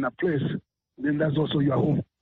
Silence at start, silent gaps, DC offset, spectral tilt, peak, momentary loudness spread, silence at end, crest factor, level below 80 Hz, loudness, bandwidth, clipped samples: 0 s; none; under 0.1%; -6.5 dB/octave; -12 dBFS; 8 LU; 0.2 s; 12 dB; -58 dBFS; -26 LUFS; 4.2 kHz; under 0.1%